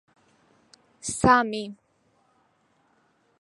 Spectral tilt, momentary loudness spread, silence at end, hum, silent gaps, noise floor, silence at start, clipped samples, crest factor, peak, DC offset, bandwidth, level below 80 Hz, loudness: -4 dB/octave; 17 LU; 1.7 s; none; none; -67 dBFS; 1.05 s; under 0.1%; 24 dB; -4 dBFS; under 0.1%; 11.5 kHz; -52 dBFS; -23 LUFS